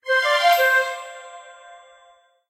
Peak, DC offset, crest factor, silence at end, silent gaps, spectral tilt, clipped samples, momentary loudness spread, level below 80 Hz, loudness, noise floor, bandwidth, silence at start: -4 dBFS; under 0.1%; 18 dB; 0.75 s; none; 3 dB/octave; under 0.1%; 23 LU; -82 dBFS; -18 LUFS; -55 dBFS; 16 kHz; 0.05 s